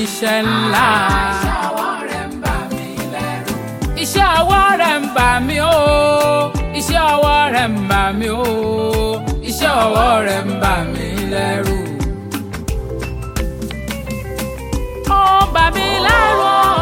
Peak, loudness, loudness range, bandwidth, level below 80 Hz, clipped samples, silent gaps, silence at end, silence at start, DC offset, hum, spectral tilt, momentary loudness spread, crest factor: 0 dBFS; -16 LUFS; 8 LU; 17 kHz; -26 dBFS; under 0.1%; none; 0 s; 0 s; under 0.1%; none; -4.5 dB/octave; 12 LU; 14 dB